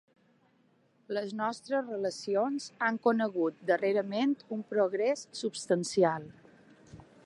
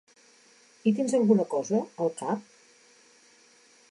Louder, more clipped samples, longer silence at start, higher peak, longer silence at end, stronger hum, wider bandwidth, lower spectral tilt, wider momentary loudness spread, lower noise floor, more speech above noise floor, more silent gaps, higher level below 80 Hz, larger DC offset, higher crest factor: second, -31 LUFS vs -27 LUFS; neither; first, 1.1 s vs 0.85 s; about the same, -12 dBFS vs -10 dBFS; second, 0.25 s vs 1.5 s; neither; about the same, 11.5 kHz vs 11 kHz; second, -5 dB/octave vs -6.5 dB/octave; about the same, 8 LU vs 10 LU; first, -68 dBFS vs -59 dBFS; first, 38 dB vs 33 dB; neither; about the same, -76 dBFS vs -80 dBFS; neither; about the same, 20 dB vs 20 dB